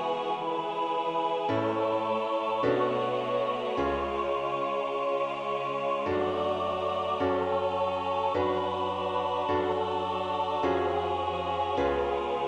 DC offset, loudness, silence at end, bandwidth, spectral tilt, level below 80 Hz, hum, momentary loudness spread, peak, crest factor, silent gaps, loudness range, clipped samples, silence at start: under 0.1%; -29 LUFS; 0 s; 9.8 kHz; -6.5 dB/octave; -54 dBFS; none; 3 LU; -16 dBFS; 14 dB; none; 1 LU; under 0.1%; 0 s